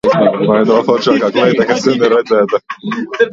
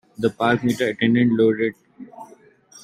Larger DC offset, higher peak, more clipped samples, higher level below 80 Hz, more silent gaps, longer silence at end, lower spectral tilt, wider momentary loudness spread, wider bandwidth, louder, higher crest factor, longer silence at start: neither; first, 0 dBFS vs -4 dBFS; neither; first, -52 dBFS vs -62 dBFS; neither; second, 0 s vs 0.6 s; about the same, -5.5 dB/octave vs -6.5 dB/octave; second, 8 LU vs 12 LU; second, 7.6 kHz vs 13.5 kHz; first, -12 LUFS vs -20 LUFS; second, 12 dB vs 18 dB; second, 0.05 s vs 0.2 s